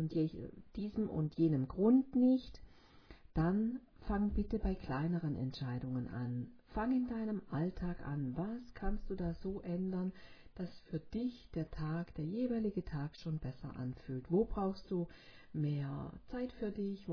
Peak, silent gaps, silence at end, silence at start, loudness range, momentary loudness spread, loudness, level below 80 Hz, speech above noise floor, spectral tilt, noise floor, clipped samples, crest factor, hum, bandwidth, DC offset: -20 dBFS; none; 0 s; 0 s; 7 LU; 12 LU; -39 LUFS; -50 dBFS; 22 dB; -8.5 dB/octave; -59 dBFS; under 0.1%; 18 dB; none; 5.4 kHz; under 0.1%